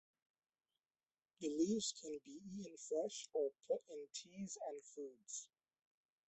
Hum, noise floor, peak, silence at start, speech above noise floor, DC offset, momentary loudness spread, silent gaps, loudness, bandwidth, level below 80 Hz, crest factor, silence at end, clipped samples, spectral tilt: none; under -90 dBFS; -28 dBFS; 1.4 s; over 45 dB; under 0.1%; 13 LU; none; -45 LUFS; 8.4 kHz; -86 dBFS; 20 dB; 0.85 s; under 0.1%; -4 dB/octave